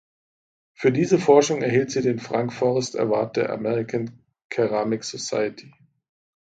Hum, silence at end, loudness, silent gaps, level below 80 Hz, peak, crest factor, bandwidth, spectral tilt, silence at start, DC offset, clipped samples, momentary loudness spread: none; 0.75 s; -23 LUFS; 4.44-4.50 s; -64 dBFS; -2 dBFS; 20 dB; 9.2 kHz; -5.5 dB/octave; 0.8 s; under 0.1%; under 0.1%; 10 LU